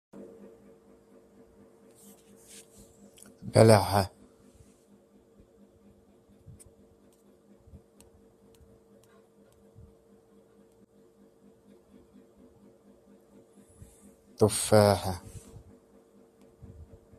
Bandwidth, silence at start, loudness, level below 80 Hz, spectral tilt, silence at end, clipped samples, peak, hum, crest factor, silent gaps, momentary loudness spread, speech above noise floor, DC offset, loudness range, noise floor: 15 kHz; 0.2 s; -24 LUFS; -62 dBFS; -5.5 dB/octave; 1.8 s; under 0.1%; -4 dBFS; none; 30 dB; none; 33 LU; 38 dB; under 0.1%; 7 LU; -61 dBFS